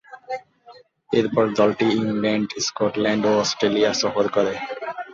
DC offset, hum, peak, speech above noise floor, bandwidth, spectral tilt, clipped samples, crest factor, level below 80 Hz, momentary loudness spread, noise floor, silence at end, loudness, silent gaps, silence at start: under 0.1%; none; -4 dBFS; 29 dB; 7.6 kHz; -4.5 dB/octave; under 0.1%; 16 dB; -60 dBFS; 12 LU; -49 dBFS; 0 s; -21 LUFS; none; 0.1 s